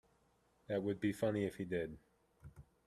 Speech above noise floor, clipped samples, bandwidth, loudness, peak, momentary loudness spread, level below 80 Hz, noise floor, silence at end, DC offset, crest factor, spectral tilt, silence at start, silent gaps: 36 dB; under 0.1%; 14 kHz; -40 LUFS; -24 dBFS; 23 LU; -68 dBFS; -75 dBFS; 0.25 s; under 0.1%; 18 dB; -7 dB/octave; 0.7 s; none